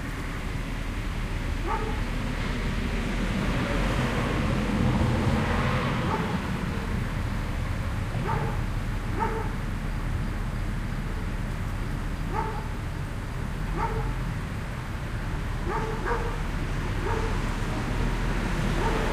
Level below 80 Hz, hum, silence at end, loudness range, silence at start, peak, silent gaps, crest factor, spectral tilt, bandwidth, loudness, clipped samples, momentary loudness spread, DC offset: -32 dBFS; none; 0 s; 6 LU; 0 s; -12 dBFS; none; 16 dB; -6 dB/octave; 15 kHz; -30 LUFS; under 0.1%; 7 LU; under 0.1%